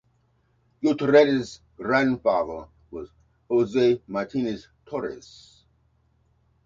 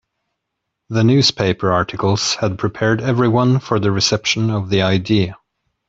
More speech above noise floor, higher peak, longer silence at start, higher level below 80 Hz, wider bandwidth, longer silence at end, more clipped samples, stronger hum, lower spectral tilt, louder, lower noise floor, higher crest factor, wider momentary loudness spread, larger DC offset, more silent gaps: second, 43 dB vs 61 dB; second, -4 dBFS vs 0 dBFS; about the same, 0.8 s vs 0.9 s; second, -58 dBFS vs -48 dBFS; about the same, 7.6 kHz vs 8 kHz; first, 1.45 s vs 0.55 s; neither; neither; first, -6.5 dB/octave vs -5 dB/octave; second, -24 LUFS vs -16 LUFS; second, -66 dBFS vs -77 dBFS; about the same, 20 dB vs 16 dB; first, 22 LU vs 5 LU; neither; neither